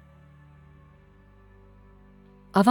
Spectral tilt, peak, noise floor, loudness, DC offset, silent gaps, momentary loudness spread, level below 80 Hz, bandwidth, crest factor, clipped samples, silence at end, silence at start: -7 dB/octave; -4 dBFS; -54 dBFS; -24 LUFS; under 0.1%; none; 29 LU; -58 dBFS; 17 kHz; 24 dB; under 0.1%; 0 s; 2.55 s